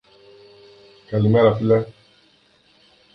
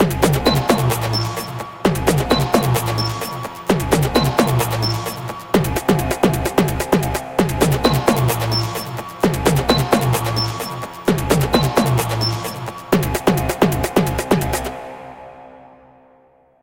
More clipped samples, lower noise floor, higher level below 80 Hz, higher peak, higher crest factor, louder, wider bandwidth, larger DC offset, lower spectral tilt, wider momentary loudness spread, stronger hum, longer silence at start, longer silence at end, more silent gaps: neither; first, -57 dBFS vs -53 dBFS; second, -52 dBFS vs -34 dBFS; about the same, -4 dBFS vs -2 dBFS; about the same, 18 dB vs 18 dB; about the same, -18 LUFS vs -18 LUFS; second, 5.8 kHz vs 17 kHz; neither; first, -10 dB/octave vs -5.5 dB/octave; about the same, 11 LU vs 10 LU; neither; first, 1.1 s vs 0 s; first, 1.25 s vs 1 s; neither